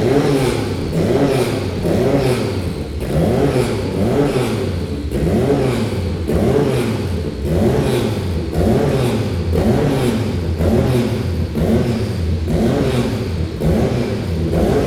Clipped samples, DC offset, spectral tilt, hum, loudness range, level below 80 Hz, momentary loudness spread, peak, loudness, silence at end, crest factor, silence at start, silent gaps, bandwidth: under 0.1%; under 0.1%; -7 dB/octave; none; 1 LU; -28 dBFS; 5 LU; -2 dBFS; -17 LUFS; 0 s; 14 dB; 0 s; none; 16.5 kHz